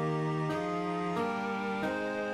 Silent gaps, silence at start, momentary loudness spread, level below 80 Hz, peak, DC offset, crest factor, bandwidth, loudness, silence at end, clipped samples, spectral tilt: none; 0 s; 2 LU; -68 dBFS; -20 dBFS; under 0.1%; 12 dB; 13.5 kHz; -33 LUFS; 0 s; under 0.1%; -7 dB/octave